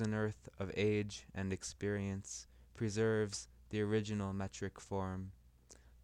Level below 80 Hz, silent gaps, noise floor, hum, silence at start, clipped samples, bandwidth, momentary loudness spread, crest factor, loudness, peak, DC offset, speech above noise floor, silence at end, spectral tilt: -62 dBFS; none; -63 dBFS; none; 0 s; under 0.1%; 11.5 kHz; 11 LU; 16 dB; -40 LUFS; -24 dBFS; under 0.1%; 24 dB; 0.15 s; -5.5 dB/octave